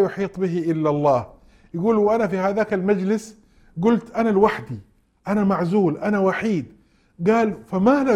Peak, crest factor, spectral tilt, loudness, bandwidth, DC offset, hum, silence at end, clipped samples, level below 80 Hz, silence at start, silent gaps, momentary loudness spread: -4 dBFS; 18 dB; -8 dB/octave; -21 LUFS; 11 kHz; under 0.1%; none; 0 s; under 0.1%; -54 dBFS; 0 s; none; 12 LU